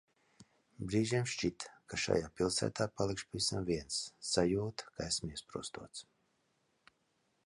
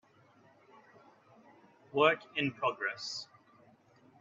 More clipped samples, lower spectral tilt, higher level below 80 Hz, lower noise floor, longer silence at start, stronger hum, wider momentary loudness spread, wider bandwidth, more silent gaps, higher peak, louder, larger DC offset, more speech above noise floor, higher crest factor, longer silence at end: neither; about the same, -4 dB/octave vs -4 dB/octave; first, -60 dBFS vs -80 dBFS; first, -78 dBFS vs -64 dBFS; second, 0.4 s vs 1.95 s; neither; about the same, 12 LU vs 13 LU; first, 11.5 kHz vs 7.8 kHz; neither; second, -16 dBFS vs -12 dBFS; second, -36 LUFS vs -33 LUFS; neither; first, 42 dB vs 32 dB; about the same, 22 dB vs 26 dB; first, 1.45 s vs 0.95 s